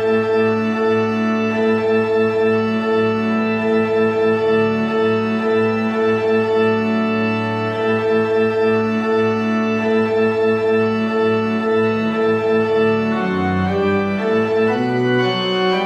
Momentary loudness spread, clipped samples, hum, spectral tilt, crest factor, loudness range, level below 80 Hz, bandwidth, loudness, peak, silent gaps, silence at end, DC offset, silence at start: 2 LU; under 0.1%; none; -7 dB/octave; 10 dB; 1 LU; -58 dBFS; 8.4 kHz; -17 LUFS; -6 dBFS; none; 0 s; under 0.1%; 0 s